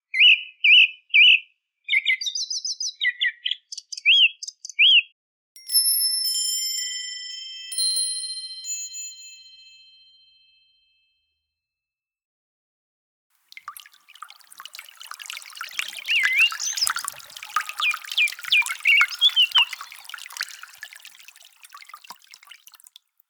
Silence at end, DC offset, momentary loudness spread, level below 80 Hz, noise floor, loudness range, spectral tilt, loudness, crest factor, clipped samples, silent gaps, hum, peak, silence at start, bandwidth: 0.95 s; under 0.1%; 23 LU; -84 dBFS; -90 dBFS; 18 LU; 6.5 dB/octave; -19 LUFS; 22 dB; under 0.1%; 5.12-5.55 s, 12.25-13.30 s; none; -4 dBFS; 0.15 s; over 20 kHz